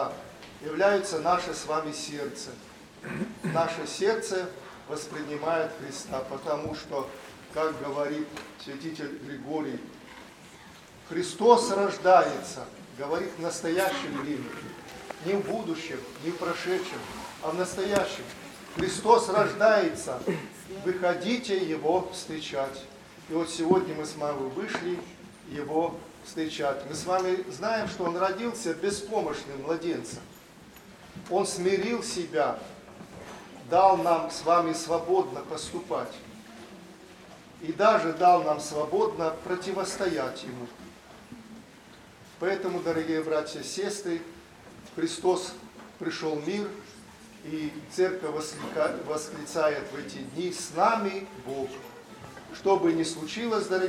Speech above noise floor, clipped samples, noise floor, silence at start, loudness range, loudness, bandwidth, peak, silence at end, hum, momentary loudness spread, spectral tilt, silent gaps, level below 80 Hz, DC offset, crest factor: 23 dB; under 0.1%; -51 dBFS; 0 s; 7 LU; -29 LUFS; 16 kHz; -4 dBFS; 0 s; none; 22 LU; -4.5 dB/octave; none; -62 dBFS; under 0.1%; 26 dB